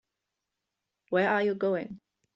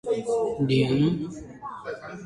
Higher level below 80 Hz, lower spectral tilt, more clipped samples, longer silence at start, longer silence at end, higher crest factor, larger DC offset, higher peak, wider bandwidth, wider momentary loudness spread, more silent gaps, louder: second, -74 dBFS vs -54 dBFS; about the same, -7.5 dB/octave vs -7 dB/octave; neither; first, 1.1 s vs 0.05 s; first, 0.4 s vs 0 s; about the same, 18 dB vs 16 dB; neither; second, -14 dBFS vs -10 dBFS; second, 7.2 kHz vs 11.5 kHz; second, 8 LU vs 15 LU; neither; second, -28 LUFS vs -25 LUFS